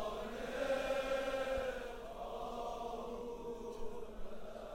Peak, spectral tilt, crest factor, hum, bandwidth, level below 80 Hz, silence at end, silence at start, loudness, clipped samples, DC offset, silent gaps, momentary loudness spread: -26 dBFS; -4 dB/octave; 16 dB; none; 16 kHz; -54 dBFS; 0 s; 0 s; -42 LUFS; under 0.1%; under 0.1%; none; 12 LU